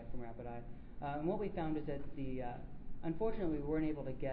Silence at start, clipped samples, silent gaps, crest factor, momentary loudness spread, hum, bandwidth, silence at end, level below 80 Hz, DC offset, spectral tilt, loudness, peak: 0 s; under 0.1%; none; 14 dB; 12 LU; none; 4.4 kHz; 0 s; -50 dBFS; under 0.1%; -7.5 dB/octave; -42 LUFS; -24 dBFS